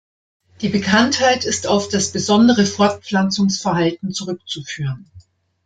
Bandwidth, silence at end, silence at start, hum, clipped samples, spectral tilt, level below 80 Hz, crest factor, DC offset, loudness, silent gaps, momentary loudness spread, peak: 9.4 kHz; 0.45 s; 0.6 s; none; under 0.1%; -4 dB/octave; -54 dBFS; 16 dB; under 0.1%; -17 LUFS; none; 12 LU; -2 dBFS